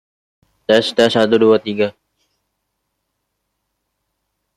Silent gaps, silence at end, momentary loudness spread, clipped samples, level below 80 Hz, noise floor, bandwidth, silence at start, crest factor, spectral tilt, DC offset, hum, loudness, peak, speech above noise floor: none; 2.65 s; 9 LU; under 0.1%; -62 dBFS; -73 dBFS; 12.5 kHz; 0.7 s; 18 dB; -5 dB/octave; under 0.1%; none; -15 LUFS; -2 dBFS; 60 dB